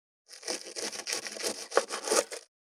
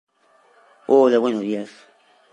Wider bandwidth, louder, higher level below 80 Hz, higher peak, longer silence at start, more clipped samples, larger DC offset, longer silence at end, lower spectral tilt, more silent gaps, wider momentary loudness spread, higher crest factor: first, 17.5 kHz vs 9.2 kHz; second, -32 LUFS vs -19 LUFS; second, under -90 dBFS vs -78 dBFS; about the same, -6 dBFS vs -4 dBFS; second, 0.3 s vs 0.9 s; neither; neither; second, 0.2 s vs 0.65 s; second, 0 dB/octave vs -6.5 dB/octave; neither; second, 12 LU vs 22 LU; first, 28 dB vs 18 dB